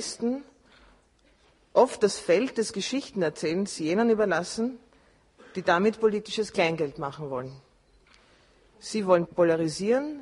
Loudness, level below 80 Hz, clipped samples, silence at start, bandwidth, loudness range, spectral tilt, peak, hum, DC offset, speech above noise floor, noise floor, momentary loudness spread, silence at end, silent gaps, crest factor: -26 LUFS; -64 dBFS; under 0.1%; 0 s; 11.5 kHz; 3 LU; -4.5 dB/octave; -8 dBFS; none; under 0.1%; 36 dB; -62 dBFS; 12 LU; 0 s; none; 20 dB